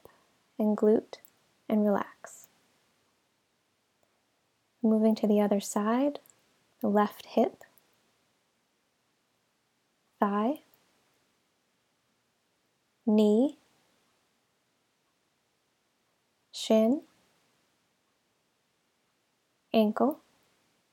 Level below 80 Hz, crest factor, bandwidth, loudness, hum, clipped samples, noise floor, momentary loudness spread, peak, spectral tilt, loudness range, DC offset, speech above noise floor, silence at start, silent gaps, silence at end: -84 dBFS; 22 dB; 17 kHz; -28 LUFS; none; under 0.1%; -75 dBFS; 17 LU; -12 dBFS; -6.5 dB/octave; 8 LU; under 0.1%; 48 dB; 0.6 s; none; 0.75 s